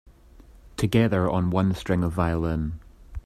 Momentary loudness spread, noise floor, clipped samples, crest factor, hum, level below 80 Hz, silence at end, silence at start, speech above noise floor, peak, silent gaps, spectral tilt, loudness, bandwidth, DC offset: 16 LU; -50 dBFS; under 0.1%; 18 dB; none; -42 dBFS; 0.05 s; 0.4 s; 27 dB; -6 dBFS; none; -7.5 dB/octave; -24 LUFS; 14.5 kHz; under 0.1%